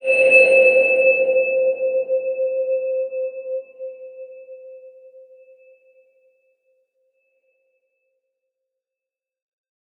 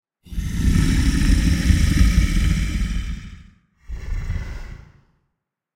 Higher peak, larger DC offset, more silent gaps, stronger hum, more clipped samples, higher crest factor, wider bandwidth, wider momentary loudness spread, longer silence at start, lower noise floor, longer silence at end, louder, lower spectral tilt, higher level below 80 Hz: about the same, -2 dBFS vs -2 dBFS; neither; neither; neither; neither; about the same, 20 dB vs 18 dB; second, 9.4 kHz vs 15.5 kHz; first, 26 LU vs 18 LU; second, 0.05 s vs 0.25 s; first, -88 dBFS vs -77 dBFS; first, 5.1 s vs 1 s; first, -16 LUFS vs -21 LUFS; second, -3 dB/octave vs -5.5 dB/octave; second, -82 dBFS vs -22 dBFS